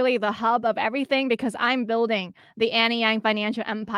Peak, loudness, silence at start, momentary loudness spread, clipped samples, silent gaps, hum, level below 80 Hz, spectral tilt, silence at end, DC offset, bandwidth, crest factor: -8 dBFS; -23 LUFS; 0 s; 6 LU; under 0.1%; none; none; -70 dBFS; -5 dB/octave; 0 s; under 0.1%; 12 kHz; 16 dB